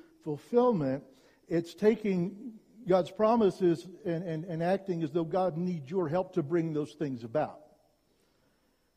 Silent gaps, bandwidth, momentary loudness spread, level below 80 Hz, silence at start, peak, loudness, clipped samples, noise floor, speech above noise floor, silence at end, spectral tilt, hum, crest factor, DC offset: none; 12 kHz; 11 LU; -70 dBFS; 0.25 s; -12 dBFS; -31 LUFS; under 0.1%; -71 dBFS; 42 dB; 1.4 s; -8 dB/octave; none; 18 dB; under 0.1%